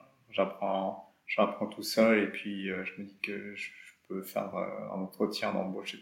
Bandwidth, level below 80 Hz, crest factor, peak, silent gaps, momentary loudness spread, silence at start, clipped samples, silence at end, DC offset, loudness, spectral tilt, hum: 16.5 kHz; -80 dBFS; 22 dB; -10 dBFS; none; 14 LU; 0.3 s; under 0.1%; 0 s; under 0.1%; -33 LUFS; -5 dB/octave; none